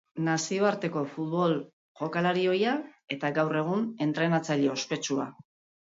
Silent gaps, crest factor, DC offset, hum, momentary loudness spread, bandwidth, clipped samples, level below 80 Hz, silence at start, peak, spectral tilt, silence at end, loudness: 1.73-1.95 s; 16 dB; under 0.1%; none; 7 LU; 7.8 kHz; under 0.1%; -76 dBFS; 0.15 s; -14 dBFS; -5 dB/octave; 0.5 s; -29 LUFS